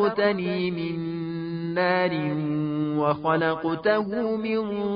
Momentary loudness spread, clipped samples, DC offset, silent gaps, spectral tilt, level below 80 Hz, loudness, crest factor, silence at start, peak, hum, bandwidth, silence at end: 7 LU; under 0.1%; under 0.1%; none; -11 dB/octave; -60 dBFS; -25 LUFS; 16 dB; 0 s; -8 dBFS; none; 5.2 kHz; 0 s